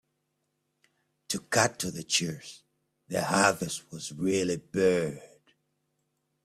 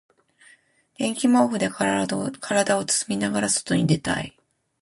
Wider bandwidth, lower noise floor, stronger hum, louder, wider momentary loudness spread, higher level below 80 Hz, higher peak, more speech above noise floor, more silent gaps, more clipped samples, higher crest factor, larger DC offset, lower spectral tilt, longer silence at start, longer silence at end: first, 14.5 kHz vs 11.5 kHz; first, -79 dBFS vs -58 dBFS; neither; second, -28 LUFS vs -23 LUFS; first, 13 LU vs 8 LU; second, -66 dBFS vs -56 dBFS; about the same, -8 dBFS vs -6 dBFS; first, 50 dB vs 35 dB; neither; neither; first, 24 dB vs 18 dB; neither; about the same, -3.5 dB/octave vs -4 dB/octave; first, 1.3 s vs 1 s; first, 1.2 s vs 0.5 s